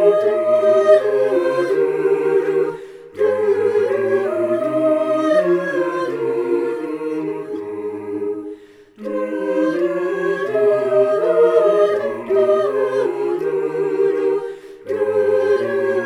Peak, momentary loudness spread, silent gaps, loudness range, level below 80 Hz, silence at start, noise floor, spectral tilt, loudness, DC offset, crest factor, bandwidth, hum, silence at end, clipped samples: -2 dBFS; 12 LU; none; 7 LU; -68 dBFS; 0 s; -40 dBFS; -6.5 dB/octave; -18 LUFS; under 0.1%; 16 dB; 11 kHz; none; 0 s; under 0.1%